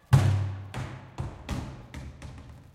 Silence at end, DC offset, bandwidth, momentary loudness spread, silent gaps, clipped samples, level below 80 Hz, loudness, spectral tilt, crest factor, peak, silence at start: 0.1 s; under 0.1%; 15 kHz; 21 LU; none; under 0.1%; -44 dBFS; -31 LUFS; -7 dB/octave; 22 dB; -8 dBFS; 0.1 s